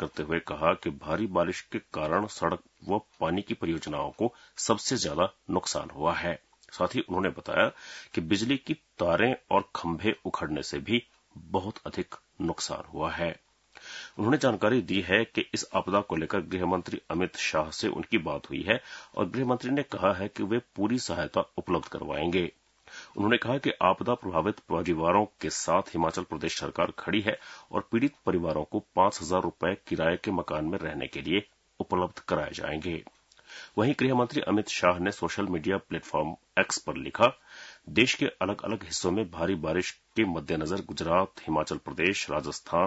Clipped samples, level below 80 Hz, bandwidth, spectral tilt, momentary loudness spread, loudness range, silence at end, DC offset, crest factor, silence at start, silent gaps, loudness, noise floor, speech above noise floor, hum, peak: under 0.1%; -58 dBFS; 8 kHz; -4.5 dB/octave; 9 LU; 3 LU; 0 s; under 0.1%; 24 dB; 0 s; none; -29 LUFS; -50 dBFS; 21 dB; none; -6 dBFS